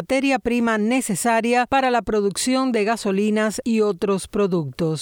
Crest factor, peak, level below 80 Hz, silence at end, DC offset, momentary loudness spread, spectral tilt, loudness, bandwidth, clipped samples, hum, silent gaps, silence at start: 12 dB; -8 dBFS; -50 dBFS; 0 s; under 0.1%; 3 LU; -4.5 dB/octave; -20 LUFS; 19.5 kHz; under 0.1%; none; none; 0 s